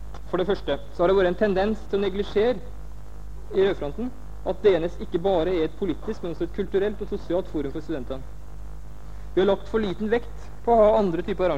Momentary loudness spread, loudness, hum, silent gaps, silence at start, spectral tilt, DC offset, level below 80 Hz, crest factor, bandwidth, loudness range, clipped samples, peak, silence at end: 22 LU; -25 LUFS; 50 Hz at -50 dBFS; none; 0 s; -7.5 dB/octave; 2%; -40 dBFS; 16 dB; 9.2 kHz; 4 LU; under 0.1%; -8 dBFS; 0 s